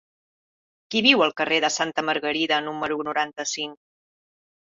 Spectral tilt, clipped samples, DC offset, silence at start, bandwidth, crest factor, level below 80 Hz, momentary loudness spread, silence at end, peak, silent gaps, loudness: -2 dB/octave; under 0.1%; under 0.1%; 0.9 s; 7.8 kHz; 22 dB; -70 dBFS; 10 LU; 0.95 s; -4 dBFS; none; -22 LUFS